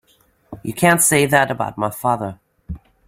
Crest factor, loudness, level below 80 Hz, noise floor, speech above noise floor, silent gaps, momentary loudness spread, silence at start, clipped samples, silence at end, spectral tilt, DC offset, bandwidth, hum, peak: 18 dB; -16 LUFS; -46 dBFS; -58 dBFS; 41 dB; none; 22 LU; 0.5 s; under 0.1%; 0.3 s; -4 dB/octave; under 0.1%; 16.5 kHz; none; 0 dBFS